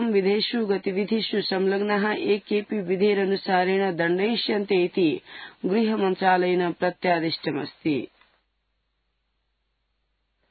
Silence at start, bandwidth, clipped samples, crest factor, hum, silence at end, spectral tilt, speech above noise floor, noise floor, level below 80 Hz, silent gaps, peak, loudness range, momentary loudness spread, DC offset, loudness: 0 s; 4.8 kHz; under 0.1%; 18 dB; none; 2.45 s; -10.5 dB/octave; 51 dB; -74 dBFS; -72 dBFS; none; -6 dBFS; 6 LU; 6 LU; under 0.1%; -24 LUFS